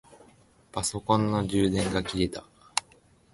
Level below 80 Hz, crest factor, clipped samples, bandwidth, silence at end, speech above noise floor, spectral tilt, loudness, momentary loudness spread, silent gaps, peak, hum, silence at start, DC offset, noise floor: -48 dBFS; 24 dB; under 0.1%; 12 kHz; 0.55 s; 33 dB; -5 dB/octave; -28 LUFS; 7 LU; none; -6 dBFS; none; 0.1 s; under 0.1%; -60 dBFS